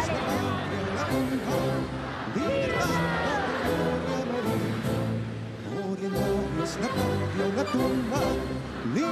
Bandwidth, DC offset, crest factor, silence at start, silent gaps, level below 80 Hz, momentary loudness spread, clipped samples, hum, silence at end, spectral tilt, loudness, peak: 14 kHz; under 0.1%; 14 dB; 0 s; none; -46 dBFS; 6 LU; under 0.1%; none; 0 s; -6 dB/octave; -28 LUFS; -12 dBFS